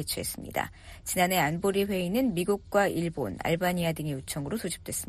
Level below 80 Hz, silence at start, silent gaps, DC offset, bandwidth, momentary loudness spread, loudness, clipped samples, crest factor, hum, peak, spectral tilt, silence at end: -52 dBFS; 0 s; none; under 0.1%; 14 kHz; 8 LU; -29 LUFS; under 0.1%; 18 dB; none; -10 dBFS; -4.5 dB/octave; 0 s